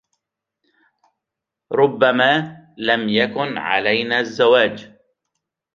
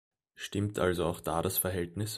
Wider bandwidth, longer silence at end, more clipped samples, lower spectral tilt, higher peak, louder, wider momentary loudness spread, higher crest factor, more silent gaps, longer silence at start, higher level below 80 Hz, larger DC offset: second, 7.4 kHz vs 15.5 kHz; first, 0.9 s vs 0 s; neither; about the same, -5.5 dB/octave vs -4.5 dB/octave; first, -2 dBFS vs -14 dBFS; first, -17 LUFS vs -32 LUFS; first, 10 LU vs 6 LU; about the same, 18 dB vs 20 dB; neither; first, 1.7 s vs 0.4 s; second, -66 dBFS vs -54 dBFS; neither